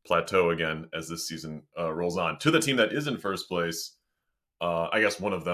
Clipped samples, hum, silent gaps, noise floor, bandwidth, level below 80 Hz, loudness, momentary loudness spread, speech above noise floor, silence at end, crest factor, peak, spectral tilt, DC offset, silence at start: under 0.1%; none; none; -81 dBFS; 16 kHz; -58 dBFS; -28 LUFS; 11 LU; 54 dB; 0 s; 20 dB; -8 dBFS; -4 dB/octave; under 0.1%; 0.05 s